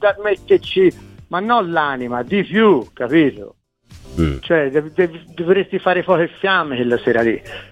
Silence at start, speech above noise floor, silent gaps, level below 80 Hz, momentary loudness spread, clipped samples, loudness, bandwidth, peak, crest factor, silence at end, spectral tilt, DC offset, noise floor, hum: 0 s; 26 dB; none; -40 dBFS; 7 LU; under 0.1%; -17 LUFS; 8.8 kHz; -2 dBFS; 16 dB; 0.1 s; -7 dB/octave; under 0.1%; -43 dBFS; none